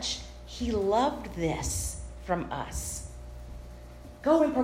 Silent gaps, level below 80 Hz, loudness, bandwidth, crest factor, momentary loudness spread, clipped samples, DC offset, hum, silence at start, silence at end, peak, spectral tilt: none; -42 dBFS; -30 LUFS; 16 kHz; 18 dB; 20 LU; under 0.1%; under 0.1%; none; 0 s; 0 s; -12 dBFS; -4.5 dB/octave